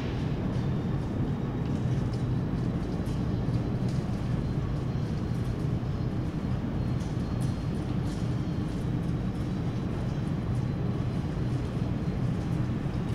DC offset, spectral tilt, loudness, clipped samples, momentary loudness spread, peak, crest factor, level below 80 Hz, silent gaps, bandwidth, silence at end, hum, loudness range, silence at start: under 0.1%; -8.5 dB/octave; -31 LUFS; under 0.1%; 2 LU; -16 dBFS; 12 dB; -40 dBFS; none; 11.5 kHz; 0 s; none; 1 LU; 0 s